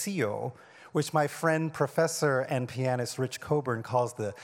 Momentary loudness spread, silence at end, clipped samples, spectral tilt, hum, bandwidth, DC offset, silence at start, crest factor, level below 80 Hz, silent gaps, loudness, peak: 6 LU; 0 s; under 0.1%; -5.5 dB/octave; none; 17.5 kHz; under 0.1%; 0 s; 18 dB; -72 dBFS; none; -30 LUFS; -12 dBFS